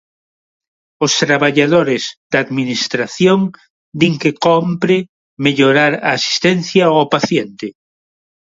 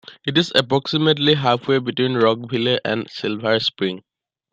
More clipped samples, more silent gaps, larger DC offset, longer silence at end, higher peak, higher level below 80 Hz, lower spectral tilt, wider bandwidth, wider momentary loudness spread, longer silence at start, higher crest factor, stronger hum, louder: neither; first, 2.17-2.30 s, 3.70-3.92 s, 5.09-5.37 s vs none; neither; first, 0.85 s vs 0.55 s; about the same, 0 dBFS vs -2 dBFS; about the same, -58 dBFS vs -62 dBFS; second, -4.5 dB/octave vs -6 dB/octave; second, 7.8 kHz vs 11.5 kHz; about the same, 8 LU vs 8 LU; first, 1 s vs 0.1 s; about the same, 16 dB vs 18 dB; neither; first, -14 LUFS vs -19 LUFS